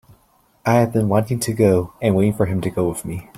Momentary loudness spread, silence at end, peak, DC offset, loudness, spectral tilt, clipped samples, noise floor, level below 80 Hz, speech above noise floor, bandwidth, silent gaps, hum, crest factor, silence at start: 6 LU; 0 s; -2 dBFS; under 0.1%; -19 LUFS; -7 dB/octave; under 0.1%; -58 dBFS; -48 dBFS; 40 dB; 16 kHz; none; none; 16 dB; 0.65 s